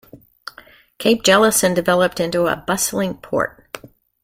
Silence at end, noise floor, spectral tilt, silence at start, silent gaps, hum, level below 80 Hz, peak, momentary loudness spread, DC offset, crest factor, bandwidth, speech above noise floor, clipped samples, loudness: 0.45 s; -47 dBFS; -3.5 dB/octave; 0.15 s; none; none; -52 dBFS; 0 dBFS; 24 LU; under 0.1%; 18 dB; 16.5 kHz; 30 dB; under 0.1%; -17 LUFS